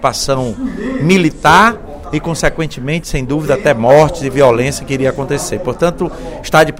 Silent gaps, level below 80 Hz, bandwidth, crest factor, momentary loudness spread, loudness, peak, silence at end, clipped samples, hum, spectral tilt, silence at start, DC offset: none; -30 dBFS; 16.5 kHz; 12 dB; 12 LU; -13 LUFS; 0 dBFS; 0 s; 0.3%; none; -5 dB/octave; 0 s; under 0.1%